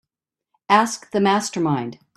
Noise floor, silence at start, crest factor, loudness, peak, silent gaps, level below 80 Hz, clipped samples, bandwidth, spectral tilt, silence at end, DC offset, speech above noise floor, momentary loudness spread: -85 dBFS; 0.7 s; 20 dB; -20 LUFS; -2 dBFS; none; -66 dBFS; under 0.1%; 13 kHz; -4.5 dB/octave; 0.2 s; under 0.1%; 66 dB; 5 LU